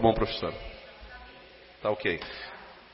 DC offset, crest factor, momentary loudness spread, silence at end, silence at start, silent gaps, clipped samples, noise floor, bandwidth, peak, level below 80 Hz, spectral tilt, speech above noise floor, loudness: under 0.1%; 24 dB; 19 LU; 0 s; 0 s; none; under 0.1%; -52 dBFS; 5.8 kHz; -8 dBFS; -46 dBFS; -9.5 dB/octave; 22 dB; -32 LUFS